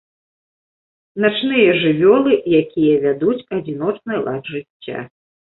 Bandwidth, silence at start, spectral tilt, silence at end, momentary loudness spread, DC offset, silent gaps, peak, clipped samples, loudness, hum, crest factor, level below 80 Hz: 4.2 kHz; 1.15 s; -11 dB/octave; 0.5 s; 16 LU; under 0.1%; 4.70-4.80 s; -2 dBFS; under 0.1%; -16 LUFS; none; 16 dB; -58 dBFS